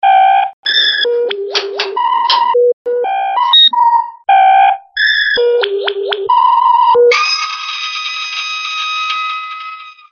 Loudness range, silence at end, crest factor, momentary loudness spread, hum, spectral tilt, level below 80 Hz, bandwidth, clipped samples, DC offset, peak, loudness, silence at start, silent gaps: 3 LU; 0.2 s; 12 dB; 10 LU; none; 0.5 dB/octave; -66 dBFS; 7 kHz; under 0.1%; under 0.1%; 0 dBFS; -11 LUFS; 0.05 s; 0.53-0.63 s, 2.73-2.85 s